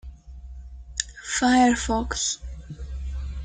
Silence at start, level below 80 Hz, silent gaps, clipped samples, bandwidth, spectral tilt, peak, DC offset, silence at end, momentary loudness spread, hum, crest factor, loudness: 0.05 s; -36 dBFS; none; under 0.1%; 9.6 kHz; -3.5 dB/octave; -4 dBFS; under 0.1%; 0 s; 25 LU; none; 22 dB; -24 LUFS